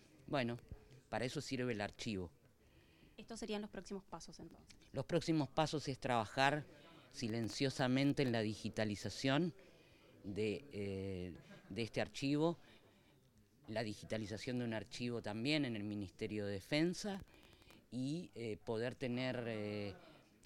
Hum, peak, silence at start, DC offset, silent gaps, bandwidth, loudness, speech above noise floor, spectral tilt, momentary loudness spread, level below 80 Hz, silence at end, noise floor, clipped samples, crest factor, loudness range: none; -18 dBFS; 0.3 s; under 0.1%; none; 16 kHz; -41 LUFS; 29 dB; -5.5 dB/octave; 15 LU; -68 dBFS; 0.3 s; -70 dBFS; under 0.1%; 24 dB; 7 LU